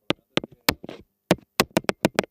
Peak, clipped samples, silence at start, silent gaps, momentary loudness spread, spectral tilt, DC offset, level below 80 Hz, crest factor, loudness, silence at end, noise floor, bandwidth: 0 dBFS; under 0.1%; 0.7 s; none; 9 LU; -4 dB/octave; under 0.1%; -52 dBFS; 26 dB; -25 LUFS; 0.1 s; -44 dBFS; 17 kHz